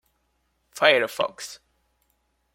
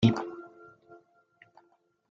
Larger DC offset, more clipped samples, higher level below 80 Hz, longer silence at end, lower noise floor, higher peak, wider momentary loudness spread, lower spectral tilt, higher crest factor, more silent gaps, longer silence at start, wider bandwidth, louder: neither; neither; second, -72 dBFS vs -66 dBFS; second, 1 s vs 1.65 s; about the same, -71 dBFS vs -68 dBFS; first, -2 dBFS vs -8 dBFS; second, 20 LU vs 26 LU; second, -2 dB/octave vs -7.5 dB/octave; about the same, 26 dB vs 24 dB; neither; first, 0.75 s vs 0 s; first, 16.5 kHz vs 7.6 kHz; first, -22 LUFS vs -32 LUFS